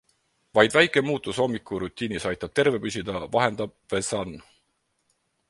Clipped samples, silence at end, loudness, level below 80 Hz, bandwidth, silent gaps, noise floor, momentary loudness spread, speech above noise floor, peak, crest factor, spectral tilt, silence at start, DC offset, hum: under 0.1%; 1.1 s; -25 LUFS; -56 dBFS; 11.5 kHz; none; -73 dBFS; 11 LU; 48 dB; -2 dBFS; 26 dB; -4 dB/octave; 0.55 s; under 0.1%; none